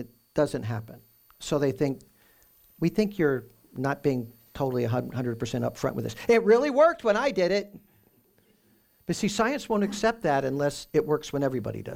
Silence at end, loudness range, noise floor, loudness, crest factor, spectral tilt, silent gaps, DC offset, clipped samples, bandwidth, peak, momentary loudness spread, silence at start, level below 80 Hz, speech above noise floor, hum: 0 s; 5 LU; -64 dBFS; -27 LUFS; 18 dB; -6 dB/octave; none; under 0.1%; under 0.1%; 17 kHz; -10 dBFS; 12 LU; 0 s; -56 dBFS; 38 dB; none